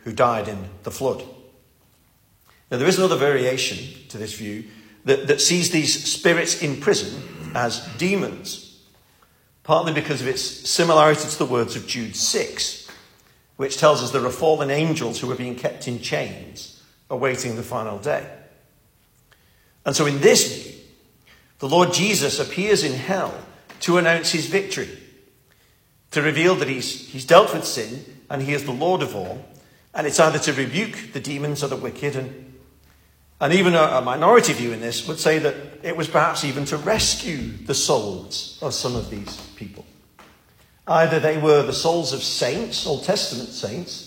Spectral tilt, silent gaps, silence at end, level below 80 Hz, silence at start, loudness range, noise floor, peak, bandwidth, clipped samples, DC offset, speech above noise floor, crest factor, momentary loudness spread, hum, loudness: -3.5 dB/octave; none; 0 s; -54 dBFS; 0.05 s; 6 LU; -59 dBFS; 0 dBFS; 16.5 kHz; under 0.1%; under 0.1%; 38 dB; 22 dB; 16 LU; none; -21 LUFS